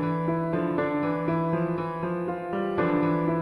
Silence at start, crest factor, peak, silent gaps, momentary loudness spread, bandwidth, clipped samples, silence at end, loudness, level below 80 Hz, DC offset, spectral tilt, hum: 0 s; 14 dB; -12 dBFS; none; 5 LU; 5.2 kHz; under 0.1%; 0 s; -27 LUFS; -58 dBFS; under 0.1%; -9.5 dB/octave; none